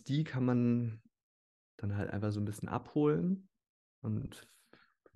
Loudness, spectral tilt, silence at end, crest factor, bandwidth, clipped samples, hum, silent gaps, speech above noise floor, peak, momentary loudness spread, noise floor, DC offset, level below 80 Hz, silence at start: -35 LUFS; -8 dB/octave; 0.75 s; 16 dB; 12 kHz; under 0.1%; none; 1.23-1.78 s, 3.69-4.02 s; 32 dB; -20 dBFS; 13 LU; -66 dBFS; under 0.1%; -66 dBFS; 0.05 s